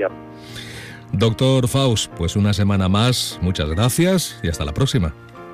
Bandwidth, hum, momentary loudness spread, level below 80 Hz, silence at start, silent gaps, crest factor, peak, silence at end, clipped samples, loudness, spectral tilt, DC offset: 15.5 kHz; none; 17 LU; -38 dBFS; 0 s; none; 12 dB; -8 dBFS; 0 s; under 0.1%; -19 LUFS; -5.5 dB/octave; under 0.1%